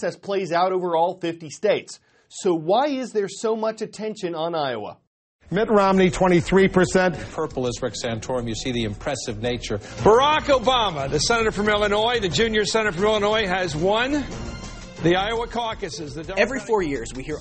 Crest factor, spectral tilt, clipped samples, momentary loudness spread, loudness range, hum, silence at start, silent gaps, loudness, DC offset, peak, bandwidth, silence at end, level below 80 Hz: 18 dB; -4.5 dB/octave; under 0.1%; 12 LU; 5 LU; none; 0 s; 5.07-5.39 s; -22 LUFS; under 0.1%; -4 dBFS; 8.8 kHz; 0 s; -42 dBFS